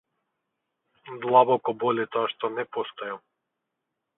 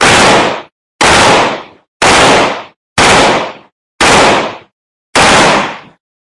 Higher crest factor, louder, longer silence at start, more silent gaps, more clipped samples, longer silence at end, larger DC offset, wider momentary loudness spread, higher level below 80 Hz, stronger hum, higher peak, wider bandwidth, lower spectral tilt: first, 22 dB vs 10 dB; second, -25 LUFS vs -7 LUFS; first, 1.05 s vs 0 s; second, none vs 0.72-0.99 s, 1.88-2.00 s, 2.76-2.96 s, 3.72-3.99 s, 4.73-5.13 s; second, under 0.1% vs 0.2%; first, 1 s vs 0.5 s; neither; about the same, 17 LU vs 16 LU; second, -78 dBFS vs -34 dBFS; neither; second, -6 dBFS vs 0 dBFS; second, 4 kHz vs 12 kHz; first, -9 dB/octave vs -2.5 dB/octave